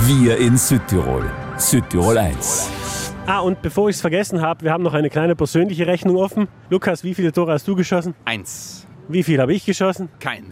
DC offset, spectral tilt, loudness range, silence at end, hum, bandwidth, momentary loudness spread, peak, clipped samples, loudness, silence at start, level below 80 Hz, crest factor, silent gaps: under 0.1%; -5 dB/octave; 3 LU; 0 s; none; 16 kHz; 9 LU; -2 dBFS; under 0.1%; -18 LUFS; 0 s; -38 dBFS; 16 dB; none